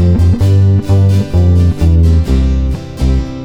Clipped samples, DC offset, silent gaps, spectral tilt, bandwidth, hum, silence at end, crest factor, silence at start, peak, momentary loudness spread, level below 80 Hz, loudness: under 0.1%; under 0.1%; none; -8.5 dB/octave; 8.4 kHz; none; 0 s; 8 dB; 0 s; 0 dBFS; 6 LU; -16 dBFS; -11 LUFS